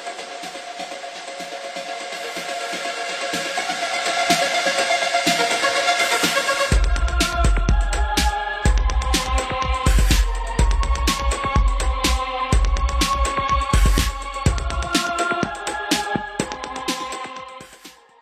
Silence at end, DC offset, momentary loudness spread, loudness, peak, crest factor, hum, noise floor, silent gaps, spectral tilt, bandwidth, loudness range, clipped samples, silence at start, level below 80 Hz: 0.3 s; under 0.1%; 13 LU; -21 LUFS; -2 dBFS; 18 dB; none; -45 dBFS; none; -3.5 dB/octave; 15 kHz; 6 LU; under 0.1%; 0 s; -24 dBFS